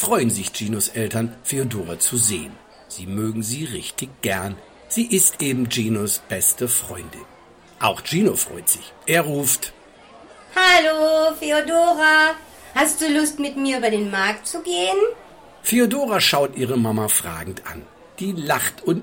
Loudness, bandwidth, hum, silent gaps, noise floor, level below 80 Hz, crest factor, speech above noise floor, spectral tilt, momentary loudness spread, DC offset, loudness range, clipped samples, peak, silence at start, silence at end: -19 LUFS; 17 kHz; none; none; -48 dBFS; -54 dBFS; 18 dB; 27 dB; -3 dB/octave; 14 LU; under 0.1%; 5 LU; under 0.1%; -2 dBFS; 0 s; 0 s